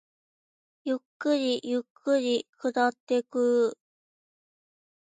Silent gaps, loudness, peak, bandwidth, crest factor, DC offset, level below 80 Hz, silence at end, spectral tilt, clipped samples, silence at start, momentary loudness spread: 1.05-1.20 s, 1.90-1.95 s, 2.49-2.53 s, 3.00-3.07 s; -28 LUFS; -12 dBFS; 9.4 kHz; 18 dB; under 0.1%; -84 dBFS; 1.3 s; -3.5 dB/octave; under 0.1%; 0.85 s; 8 LU